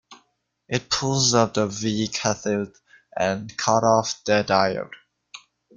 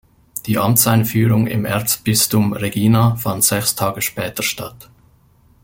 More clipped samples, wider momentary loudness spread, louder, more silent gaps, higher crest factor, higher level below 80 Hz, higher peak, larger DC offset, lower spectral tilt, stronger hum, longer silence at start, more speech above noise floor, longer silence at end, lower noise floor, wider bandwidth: neither; about the same, 10 LU vs 8 LU; second, -22 LUFS vs -16 LUFS; neither; about the same, 20 dB vs 18 dB; second, -58 dBFS vs -48 dBFS; second, -4 dBFS vs 0 dBFS; neither; about the same, -3.5 dB/octave vs -4.5 dB/octave; neither; second, 0.1 s vs 0.35 s; first, 47 dB vs 36 dB; second, 0.4 s vs 0.8 s; first, -69 dBFS vs -52 dBFS; second, 10 kHz vs 17 kHz